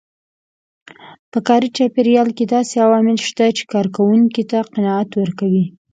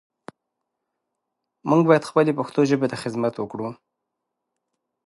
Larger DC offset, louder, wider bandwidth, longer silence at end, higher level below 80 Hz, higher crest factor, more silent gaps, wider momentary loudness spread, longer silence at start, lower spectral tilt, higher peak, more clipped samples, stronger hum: neither; first, -16 LUFS vs -21 LUFS; second, 9.2 kHz vs 11.5 kHz; second, 0.25 s vs 1.35 s; first, -64 dBFS vs -70 dBFS; second, 16 dB vs 22 dB; first, 1.19-1.32 s vs none; second, 6 LU vs 14 LU; second, 1.05 s vs 1.65 s; about the same, -6 dB/octave vs -7 dB/octave; about the same, 0 dBFS vs -2 dBFS; neither; neither